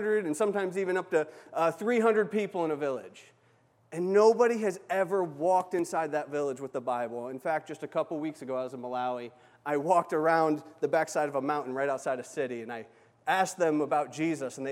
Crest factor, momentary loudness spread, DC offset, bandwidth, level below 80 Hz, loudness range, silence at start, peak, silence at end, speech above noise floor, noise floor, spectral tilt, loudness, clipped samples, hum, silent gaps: 18 dB; 10 LU; under 0.1%; 15 kHz; -86 dBFS; 5 LU; 0 s; -12 dBFS; 0 s; 36 dB; -65 dBFS; -5.5 dB/octave; -30 LUFS; under 0.1%; none; none